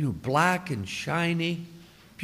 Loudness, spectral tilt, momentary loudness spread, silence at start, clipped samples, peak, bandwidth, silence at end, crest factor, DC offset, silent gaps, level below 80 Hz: -27 LUFS; -5.5 dB/octave; 11 LU; 0 s; under 0.1%; -8 dBFS; 16 kHz; 0 s; 20 dB; under 0.1%; none; -58 dBFS